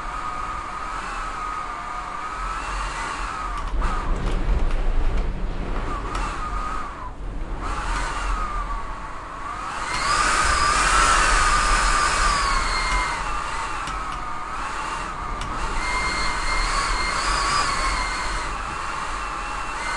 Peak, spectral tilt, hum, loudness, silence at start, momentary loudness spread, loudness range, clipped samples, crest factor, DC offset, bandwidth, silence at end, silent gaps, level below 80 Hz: -4 dBFS; -2.5 dB/octave; none; -24 LUFS; 0 s; 12 LU; 10 LU; under 0.1%; 18 dB; under 0.1%; 11.5 kHz; 0 s; none; -28 dBFS